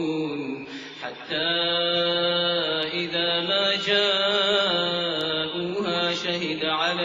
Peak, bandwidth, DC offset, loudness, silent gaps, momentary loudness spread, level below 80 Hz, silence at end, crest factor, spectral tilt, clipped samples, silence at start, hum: -8 dBFS; 7.8 kHz; under 0.1%; -23 LUFS; none; 10 LU; -64 dBFS; 0 s; 16 dB; -4 dB/octave; under 0.1%; 0 s; none